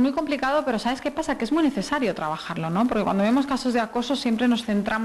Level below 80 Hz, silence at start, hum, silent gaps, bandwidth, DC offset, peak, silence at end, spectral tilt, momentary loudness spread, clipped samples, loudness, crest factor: -52 dBFS; 0 s; none; none; 12.5 kHz; under 0.1%; -12 dBFS; 0 s; -5.5 dB/octave; 5 LU; under 0.1%; -24 LUFS; 12 dB